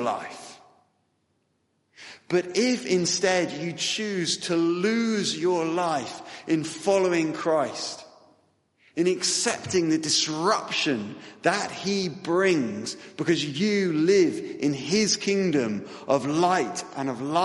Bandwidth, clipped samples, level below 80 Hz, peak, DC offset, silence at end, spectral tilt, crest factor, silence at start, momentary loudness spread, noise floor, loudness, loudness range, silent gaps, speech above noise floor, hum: 11.5 kHz; under 0.1%; -70 dBFS; -6 dBFS; under 0.1%; 0 s; -3.5 dB/octave; 20 dB; 0 s; 10 LU; -72 dBFS; -25 LUFS; 3 LU; none; 47 dB; none